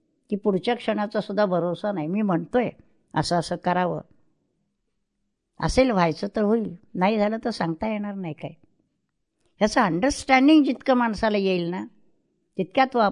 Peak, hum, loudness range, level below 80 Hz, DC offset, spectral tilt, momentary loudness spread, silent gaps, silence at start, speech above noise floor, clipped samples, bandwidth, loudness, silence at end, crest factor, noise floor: -6 dBFS; none; 5 LU; -48 dBFS; under 0.1%; -6 dB/octave; 12 LU; none; 0.3 s; 54 dB; under 0.1%; 11 kHz; -23 LUFS; 0 s; 20 dB; -77 dBFS